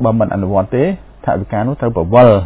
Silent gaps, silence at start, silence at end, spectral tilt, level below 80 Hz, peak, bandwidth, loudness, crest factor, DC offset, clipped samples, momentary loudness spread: none; 0 s; 0 s; -12 dB/octave; -34 dBFS; 0 dBFS; 4 kHz; -14 LUFS; 12 dB; under 0.1%; 0.4%; 10 LU